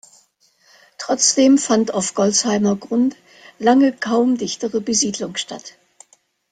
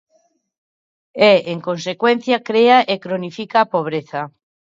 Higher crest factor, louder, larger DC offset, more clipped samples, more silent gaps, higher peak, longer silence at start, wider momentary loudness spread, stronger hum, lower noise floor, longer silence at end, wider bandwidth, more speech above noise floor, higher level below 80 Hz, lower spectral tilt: about the same, 16 dB vs 18 dB; about the same, -17 LUFS vs -16 LUFS; neither; neither; neither; about the same, -2 dBFS vs 0 dBFS; second, 1 s vs 1.15 s; second, 11 LU vs 14 LU; neither; second, -58 dBFS vs -62 dBFS; first, 0.85 s vs 0.5 s; first, 9.6 kHz vs 7.6 kHz; second, 41 dB vs 46 dB; first, -62 dBFS vs -70 dBFS; second, -3 dB/octave vs -5.5 dB/octave